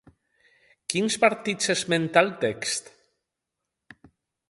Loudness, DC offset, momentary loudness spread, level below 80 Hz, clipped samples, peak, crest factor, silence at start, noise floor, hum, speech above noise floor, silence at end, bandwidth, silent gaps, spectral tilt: -24 LUFS; under 0.1%; 8 LU; -68 dBFS; under 0.1%; -4 dBFS; 24 dB; 0.9 s; -84 dBFS; none; 60 dB; 1.7 s; 11.5 kHz; none; -3 dB/octave